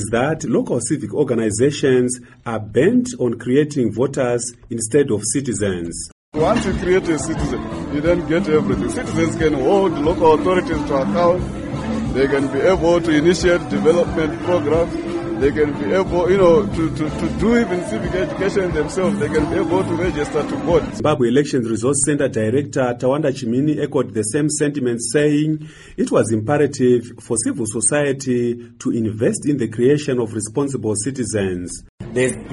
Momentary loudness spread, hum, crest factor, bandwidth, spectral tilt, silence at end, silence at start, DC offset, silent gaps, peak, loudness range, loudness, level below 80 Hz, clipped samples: 7 LU; none; 16 dB; 11.5 kHz; -5.5 dB/octave; 0 s; 0 s; under 0.1%; 6.12-6.32 s, 31.89-31.98 s; -2 dBFS; 3 LU; -18 LUFS; -38 dBFS; under 0.1%